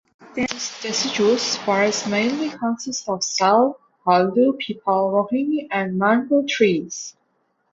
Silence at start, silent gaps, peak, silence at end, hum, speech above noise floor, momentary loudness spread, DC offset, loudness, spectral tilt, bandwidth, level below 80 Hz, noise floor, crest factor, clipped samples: 0.2 s; none; -2 dBFS; 0.6 s; none; 48 dB; 9 LU; under 0.1%; -20 LUFS; -3.5 dB/octave; 7.8 kHz; -64 dBFS; -68 dBFS; 18 dB; under 0.1%